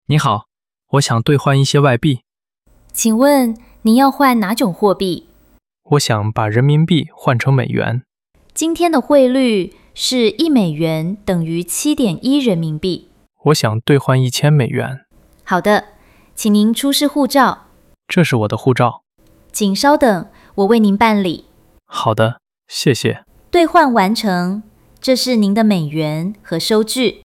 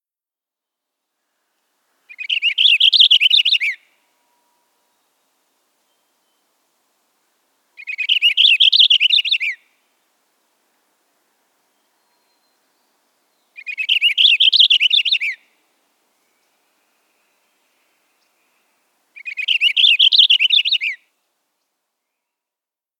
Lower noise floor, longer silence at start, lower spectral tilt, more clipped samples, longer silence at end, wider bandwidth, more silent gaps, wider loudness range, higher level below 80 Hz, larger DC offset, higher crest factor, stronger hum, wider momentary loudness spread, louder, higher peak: second, -58 dBFS vs under -90 dBFS; second, 0.1 s vs 2.2 s; first, -5.5 dB/octave vs 6.5 dB/octave; neither; second, 0.1 s vs 2.05 s; about the same, 17 kHz vs 16 kHz; neither; second, 2 LU vs 10 LU; first, -48 dBFS vs under -90 dBFS; neither; second, 14 dB vs 20 dB; neither; second, 10 LU vs 20 LU; second, -15 LUFS vs -11 LUFS; about the same, 0 dBFS vs 0 dBFS